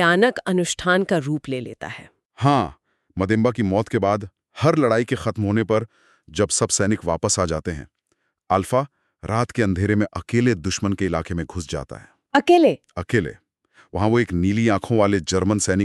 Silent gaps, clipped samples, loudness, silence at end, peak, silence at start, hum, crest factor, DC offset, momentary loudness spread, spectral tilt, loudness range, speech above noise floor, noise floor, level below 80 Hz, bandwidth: 2.26-2.30 s; under 0.1%; -21 LUFS; 0 s; -4 dBFS; 0 s; none; 18 dB; under 0.1%; 13 LU; -5 dB/octave; 2 LU; 51 dB; -72 dBFS; -46 dBFS; 12.5 kHz